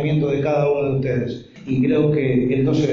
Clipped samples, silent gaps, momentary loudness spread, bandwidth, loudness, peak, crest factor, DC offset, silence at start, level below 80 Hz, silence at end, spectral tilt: under 0.1%; none; 7 LU; 7.2 kHz; -19 LUFS; -6 dBFS; 12 dB; under 0.1%; 0 s; -46 dBFS; 0 s; -8.5 dB/octave